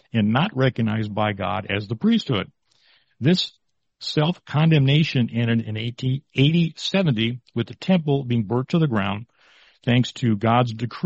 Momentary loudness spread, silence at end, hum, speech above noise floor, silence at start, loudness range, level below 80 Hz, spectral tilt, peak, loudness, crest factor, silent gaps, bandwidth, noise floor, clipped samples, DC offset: 8 LU; 0 s; none; 40 dB; 0.15 s; 3 LU; -56 dBFS; -7 dB/octave; -4 dBFS; -22 LUFS; 16 dB; none; 8 kHz; -61 dBFS; under 0.1%; under 0.1%